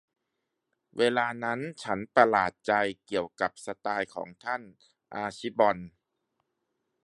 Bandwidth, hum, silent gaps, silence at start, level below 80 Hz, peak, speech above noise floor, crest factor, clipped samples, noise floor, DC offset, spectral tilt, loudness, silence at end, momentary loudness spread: 11.5 kHz; none; none; 0.95 s; -68 dBFS; -4 dBFS; 54 dB; 26 dB; under 0.1%; -83 dBFS; under 0.1%; -5 dB/octave; -29 LUFS; 1.15 s; 13 LU